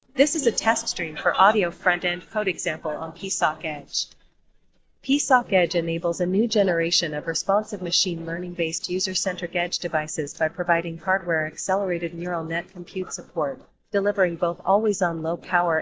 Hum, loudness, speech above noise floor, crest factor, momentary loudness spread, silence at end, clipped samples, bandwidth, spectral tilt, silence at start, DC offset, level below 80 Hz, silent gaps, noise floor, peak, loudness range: none; -24 LUFS; 35 dB; 20 dB; 10 LU; 0 s; under 0.1%; 8 kHz; -3 dB/octave; 0.15 s; under 0.1%; -60 dBFS; none; -59 dBFS; -4 dBFS; 4 LU